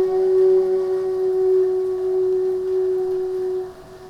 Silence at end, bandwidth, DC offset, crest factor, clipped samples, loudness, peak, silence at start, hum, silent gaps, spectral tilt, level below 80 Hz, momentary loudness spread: 0 s; 5.8 kHz; under 0.1%; 10 dB; under 0.1%; -20 LUFS; -10 dBFS; 0 s; none; none; -7.5 dB/octave; -56 dBFS; 8 LU